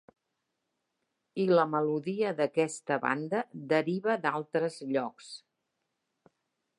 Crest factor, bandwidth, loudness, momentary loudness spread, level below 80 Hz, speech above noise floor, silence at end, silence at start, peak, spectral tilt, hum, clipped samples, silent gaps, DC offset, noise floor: 22 dB; 11.5 kHz; -30 LUFS; 12 LU; -86 dBFS; 53 dB; 1.4 s; 1.35 s; -10 dBFS; -5.5 dB/octave; none; under 0.1%; none; under 0.1%; -83 dBFS